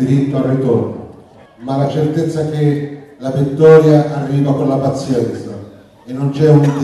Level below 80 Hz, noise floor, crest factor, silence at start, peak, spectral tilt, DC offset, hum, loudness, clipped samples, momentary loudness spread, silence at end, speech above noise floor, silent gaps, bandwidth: -50 dBFS; -40 dBFS; 14 dB; 0 s; 0 dBFS; -8.5 dB/octave; under 0.1%; none; -14 LUFS; 0.1%; 19 LU; 0 s; 28 dB; none; 11.5 kHz